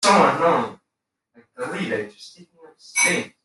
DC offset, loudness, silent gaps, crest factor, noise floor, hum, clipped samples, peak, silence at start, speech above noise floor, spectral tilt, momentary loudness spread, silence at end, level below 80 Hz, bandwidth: under 0.1%; -20 LUFS; none; 18 dB; -81 dBFS; none; under 0.1%; -4 dBFS; 0 s; 61 dB; -3 dB/octave; 16 LU; 0.15 s; -66 dBFS; 12.5 kHz